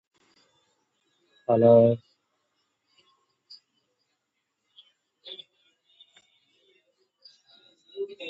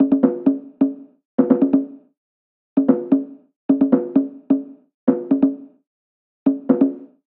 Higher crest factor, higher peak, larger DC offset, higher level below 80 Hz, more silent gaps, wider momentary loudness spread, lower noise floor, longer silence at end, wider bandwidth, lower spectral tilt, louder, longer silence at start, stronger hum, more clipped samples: first, 24 dB vs 18 dB; second, -6 dBFS vs -2 dBFS; neither; about the same, -72 dBFS vs -68 dBFS; second, none vs 1.25-1.38 s, 2.17-2.76 s, 3.56-3.69 s, 4.94-5.07 s, 5.87-6.46 s; first, 26 LU vs 15 LU; second, -80 dBFS vs under -90 dBFS; second, 0 s vs 0.35 s; first, 5.2 kHz vs 2.9 kHz; about the same, -9.5 dB/octave vs -10 dB/octave; second, -22 LUFS vs -19 LUFS; first, 1.5 s vs 0 s; neither; neither